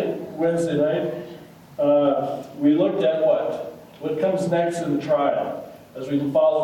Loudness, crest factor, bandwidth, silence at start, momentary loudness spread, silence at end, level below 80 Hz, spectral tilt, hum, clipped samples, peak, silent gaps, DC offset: -22 LUFS; 14 dB; 16.5 kHz; 0 s; 16 LU; 0 s; -66 dBFS; -7 dB/octave; none; under 0.1%; -8 dBFS; none; under 0.1%